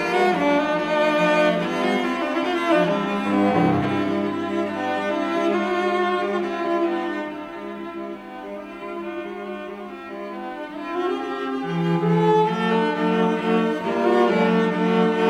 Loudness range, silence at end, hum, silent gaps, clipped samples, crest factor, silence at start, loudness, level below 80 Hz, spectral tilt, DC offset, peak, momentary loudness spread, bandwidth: 11 LU; 0 s; none; none; under 0.1%; 16 dB; 0 s; -22 LUFS; -60 dBFS; -6.5 dB/octave; under 0.1%; -6 dBFS; 14 LU; 13 kHz